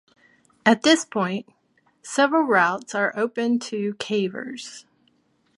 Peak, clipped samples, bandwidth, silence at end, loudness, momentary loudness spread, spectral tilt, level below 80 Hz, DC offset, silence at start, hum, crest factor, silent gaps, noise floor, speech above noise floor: -2 dBFS; under 0.1%; 11.5 kHz; 0.75 s; -22 LUFS; 15 LU; -4 dB/octave; -74 dBFS; under 0.1%; 0.65 s; none; 22 dB; none; -65 dBFS; 43 dB